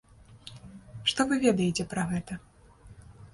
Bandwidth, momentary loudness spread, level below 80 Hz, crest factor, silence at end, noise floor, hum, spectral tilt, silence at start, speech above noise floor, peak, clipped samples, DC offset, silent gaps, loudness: 11.5 kHz; 23 LU; -56 dBFS; 22 dB; 0.05 s; -52 dBFS; none; -4.5 dB/octave; 0.3 s; 25 dB; -10 dBFS; under 0.1%; under 0.1%; none; -28 LUFS